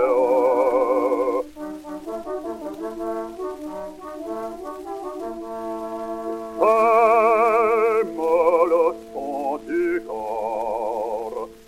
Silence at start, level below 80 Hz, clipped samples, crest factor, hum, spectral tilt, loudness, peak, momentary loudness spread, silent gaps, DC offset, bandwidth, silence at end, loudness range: 0 s; -56 dBFS; under 0.1%; 16 dB; none; -5.5 dB/octave; -22 LUFS; -6 dBFS; 16 LU; none; under 0.1%; 15.5 kHz; 0.1 s; 13 LU